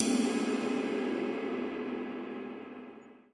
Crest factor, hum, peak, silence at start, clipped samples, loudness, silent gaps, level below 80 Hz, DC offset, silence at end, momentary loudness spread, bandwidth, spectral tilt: 26 dB; none; -8 dBFS; 0 s; under 0.1%; -34 LUFS; none; -74 dBFS; under 0.1%; 0.15 s; 16 LU; 11.5 kHz; -4 dB/octave